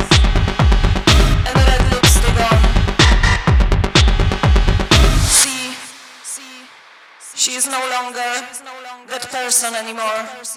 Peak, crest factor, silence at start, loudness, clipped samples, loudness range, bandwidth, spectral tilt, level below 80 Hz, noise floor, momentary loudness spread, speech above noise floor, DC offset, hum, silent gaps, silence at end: 0 dBFS; 14 dB; 0 s; -14 LUFS; under 0.1%; 9 LU; 15.5 kHz; -3.5 dB/octave; -18 dBFS; -43 dBFS; 17 LU; 22 dB; under 0.1%; none; none; 0 s